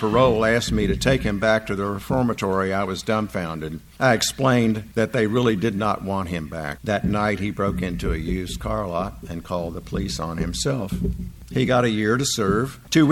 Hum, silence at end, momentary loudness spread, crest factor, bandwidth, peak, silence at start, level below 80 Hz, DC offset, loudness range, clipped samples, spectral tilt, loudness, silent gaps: none; 0 s; 9 LU; 18 dB; 17 kHz; -4 dBFS; 0 s; -36 dBFS; under 0.1%; 5 LU; under 0.1%; -5 dB/octave; -23 LUFS; none